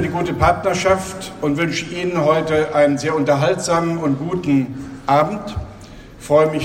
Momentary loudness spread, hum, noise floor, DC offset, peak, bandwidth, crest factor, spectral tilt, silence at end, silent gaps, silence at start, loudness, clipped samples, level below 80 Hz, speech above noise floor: 11 LU; none; -38 dBFS; under 0.1%; 0 dBFS; 16 kHz; 18 dB; -5.5 dB/octave; 0 s; none; 0 s; -18 LUFS; under 0.1%; -40 dBFS; 20 dB